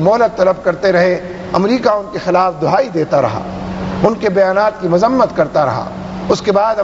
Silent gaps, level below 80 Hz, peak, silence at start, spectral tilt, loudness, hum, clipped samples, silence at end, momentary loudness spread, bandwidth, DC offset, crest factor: none; -42 dBFS; 0 dBFS; 0 s; -6.5 dB/octave; -14 LUFS; none; under 0.1%; 0 s; 9 LU; 8 kHz; under 0.1%; 14 dB